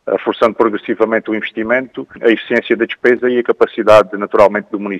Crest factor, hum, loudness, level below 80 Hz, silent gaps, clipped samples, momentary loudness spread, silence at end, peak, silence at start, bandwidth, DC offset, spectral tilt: 14 dB; none; -14 LUFS; -52 dBFS; none; 0.2%; 8 LU; 0 s; 0 dBFS; 0.05 s; 11 kHz; under 0.1%; -6 dB/octave